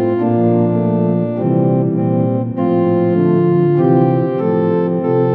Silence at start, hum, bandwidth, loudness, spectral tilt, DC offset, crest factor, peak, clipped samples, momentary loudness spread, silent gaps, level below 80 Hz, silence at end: 0 s; none; 4.3 kHz; -15 LUFS; -13 dB/octave; under 0.1%; 12 dB; -2 dBFS; under 0.1%; 4 LU; none; -60 dBFS; 0 s